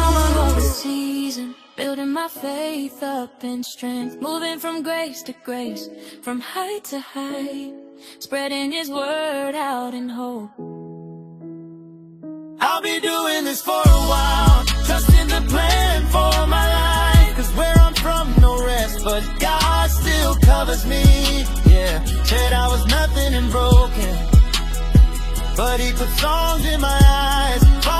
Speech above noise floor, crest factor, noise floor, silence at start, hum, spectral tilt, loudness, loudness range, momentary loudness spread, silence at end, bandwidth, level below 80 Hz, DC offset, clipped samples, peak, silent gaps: 22 dB; 16 dB; -41 dBFS; 0 s; none; -5 dB/octave; -18 LUFS; 11 LU; 16 LU; 0 s; 15.5 kHz; -18 dBFS; under 0.1%; under 0.1%; 0 dBFS; none